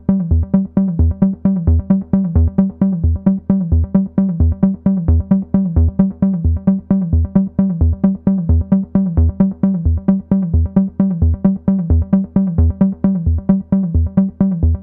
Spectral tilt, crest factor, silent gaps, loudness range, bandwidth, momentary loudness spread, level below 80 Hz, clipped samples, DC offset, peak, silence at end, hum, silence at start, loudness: -15.5 dB/octave; 12 dB; none; 0 LU; 2.1 kHz; 2 LU; -22 dBFS; under 0.1%; under 0.1%; -2 dBFS; 0 s; none; 0.1 s; -15 LUFS